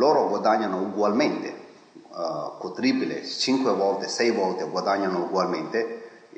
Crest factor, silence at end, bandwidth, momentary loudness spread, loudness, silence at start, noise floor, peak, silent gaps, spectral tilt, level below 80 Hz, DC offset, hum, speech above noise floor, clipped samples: 18 dB; 0.2 s; 9 kHz; 11 LU; -25 LUFS; 0 s; -48 dBFS; -8 dBFS; none; -4.5 dB/octave; -80 dBFS; under 0.1%; none; 23 dB; under 0.1%